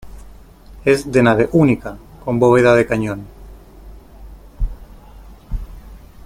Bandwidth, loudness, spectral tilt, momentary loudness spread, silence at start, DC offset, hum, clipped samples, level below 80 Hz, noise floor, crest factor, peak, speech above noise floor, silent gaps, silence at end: 16 kHz; -15 LUFS; -7 dB/octave; 20 LU; 0.05 s; under 0.1%; none; under 0.1%; -32 dBFS; -40 dBFS; 18 dB; 0 dBFS; 26 dB; none; 0.3 s